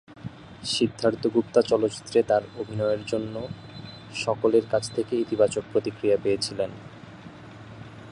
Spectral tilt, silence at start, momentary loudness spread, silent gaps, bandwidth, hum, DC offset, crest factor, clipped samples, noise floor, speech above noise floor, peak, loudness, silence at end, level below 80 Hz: -5 dB/octave; 0.1 s; 21 LU; none; 11 kHz; none; under 0.1%; 20 dB; under 0.1%; -44 dBFS; 19 dB; -6 dBFS; -25 LUFS; 0 s; -58 dBFS